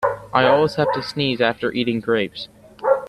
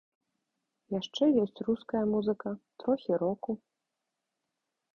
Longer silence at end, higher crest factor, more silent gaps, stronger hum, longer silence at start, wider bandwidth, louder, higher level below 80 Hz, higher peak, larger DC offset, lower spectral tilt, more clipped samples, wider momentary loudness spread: second, 0 s vs 1.4 s; about the same, 18 dB vs 18 dB; neither; neither; second, 0 s vs 0.9 s; first, 12.5 kHz vs 7.2 kHz; first, -20 LUFS vs -31 LUFS; first, -54 dBFS vs -70 dBFS; first, -2 dBFS vs -16 dBFS; neither; about the same, -6 dB/octave vs -7 dB/octave; neither; about the same, 10 LU vs 11 LU